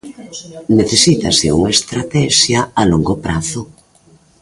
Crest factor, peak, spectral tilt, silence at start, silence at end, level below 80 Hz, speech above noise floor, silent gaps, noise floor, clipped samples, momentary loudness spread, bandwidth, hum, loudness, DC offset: 14 dB; 0 dBFS; -4 dB/octave; 0.05 s; 0.75 s; -36 dBFS; 35 dB; none; -49 dBFS; under 0.1%; 17 LU; 11.5 kHz; none; -13 LUFS; under 0.1%